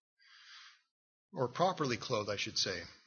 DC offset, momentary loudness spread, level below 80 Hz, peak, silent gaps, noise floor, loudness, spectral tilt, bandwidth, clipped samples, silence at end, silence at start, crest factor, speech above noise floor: under 0.1%; 21 LU; -74 dBFS; -18 dBFS; 0.91-1.29 s; -58 dBFS; -35 LUFS; -2.5 dB/octave; 6.8 kHz; under 0.1%; 0.1 s; 0.3 s; 22 dB; 22 dB